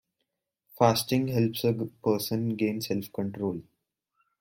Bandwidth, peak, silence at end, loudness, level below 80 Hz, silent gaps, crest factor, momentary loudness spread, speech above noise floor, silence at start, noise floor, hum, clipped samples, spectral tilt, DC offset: 16.5 kHz; -8 dBFS; 0.8 s; -28 LUFS; -66 dBFS; none; 22 dB; 9 LU; 55 dB; 0.75 s; -82 dBFS; none; under 0.1%; -6 dB/octave; under 0.1%